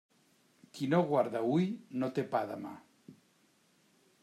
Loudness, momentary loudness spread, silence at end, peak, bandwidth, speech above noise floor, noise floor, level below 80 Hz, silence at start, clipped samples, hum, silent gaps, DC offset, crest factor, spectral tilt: -33 LUFS; 17 LU; 1.1 s; -18 dBFS; 13.5 kHz; 37 dB; -70 dBFS; -80 dBFS; 0.75 s; under 0.1%; none; none; under 0.1%; 18 dB; -7.5 dB/octave